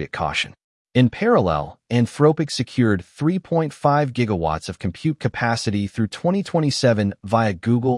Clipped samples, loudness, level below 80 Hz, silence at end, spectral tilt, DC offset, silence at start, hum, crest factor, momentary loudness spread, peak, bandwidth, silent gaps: under 0.1%; -21 LUFS; -50 dBFS; 0 s; -6.5 dB/octave; under 0.1%; 0 s; none; 16 dB; 7 LU; -4 dBFS; 12 kHz; 0.64-0.85 s